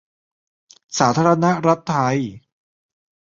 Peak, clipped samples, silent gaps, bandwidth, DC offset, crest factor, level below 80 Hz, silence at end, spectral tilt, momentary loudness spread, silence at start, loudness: -2 dBFS; under 0.1%; none; 7.8 kHz; under 0.1%; 20 dB; -58 dBFS; 0.95 s; -5.5 dB/octave; 10 LU; 0.9 s; -18 LUFS